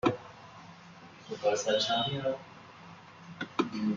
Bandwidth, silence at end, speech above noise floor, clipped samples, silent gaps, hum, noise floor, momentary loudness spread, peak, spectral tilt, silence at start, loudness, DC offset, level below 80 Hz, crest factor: 7.6 kHz; 0 s; 22 dB; under 0.1%; none; none; -52 dBFS; 22 LU; -14 dBFS; -4 dB/octave; 0.05 s; -32 LUFS; under 0.1%; -70 dBFS; 20 dB